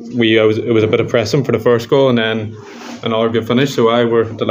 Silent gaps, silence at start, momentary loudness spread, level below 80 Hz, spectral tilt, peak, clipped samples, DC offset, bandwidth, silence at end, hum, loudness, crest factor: none; 0 s; 10 LU; -56 dBFS; -6 dB/octave; 0 dBFS; under 0.1%; under 0.1%; 16 kHz; 0 s; none; -14 LUFS; 14 dB